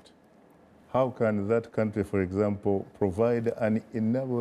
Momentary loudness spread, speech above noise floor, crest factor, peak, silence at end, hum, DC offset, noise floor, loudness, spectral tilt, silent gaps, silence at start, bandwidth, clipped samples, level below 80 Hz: 4 LU; 31 dB; 14 dB; -14 dBFS; 0 s; none; under 0.1%; -58 dBFS; -28 LUFS; -9 dB/octave; none; 0.9 s; 11.5 kHz; under 0.1%; -60 dBFS